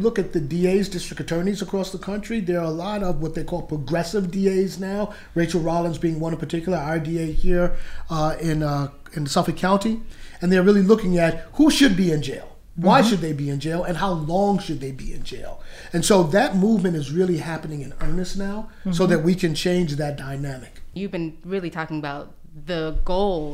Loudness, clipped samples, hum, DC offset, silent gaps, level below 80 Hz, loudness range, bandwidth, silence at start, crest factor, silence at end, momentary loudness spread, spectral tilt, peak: -22 LUFS; under 0.1%; none; under 0.1%; none; -32 dBFS; 6 LU; 15.5 kHz; 0 s; 20 dB; 0 s; 14 LU; -6 dB/octave; -2 dBFS